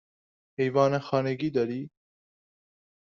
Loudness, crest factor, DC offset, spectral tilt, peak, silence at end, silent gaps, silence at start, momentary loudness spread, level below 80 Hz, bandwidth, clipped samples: -27 LUFS; 22 dB; under 0.1%; -6 dB/octave; -8 dBFS; 1.3 s; none; 0.6 s; 16 LU; -70 dBFS; 7.2 kHz; under 0.1%